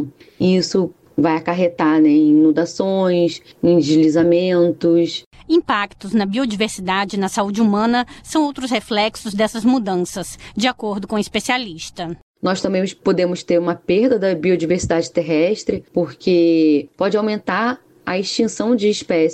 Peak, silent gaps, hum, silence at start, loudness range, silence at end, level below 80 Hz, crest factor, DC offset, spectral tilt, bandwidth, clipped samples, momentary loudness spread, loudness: -6 dBFS; 5.26-5.31 s, 12.22-12.34 s; none; 0 s; 5 LU; 0 s; -50 dBFS; 12 dB; under 0.1%; -5.5 dB/octave; 12.5 kHz; under 0.1%; 8 LU; -18 LUFS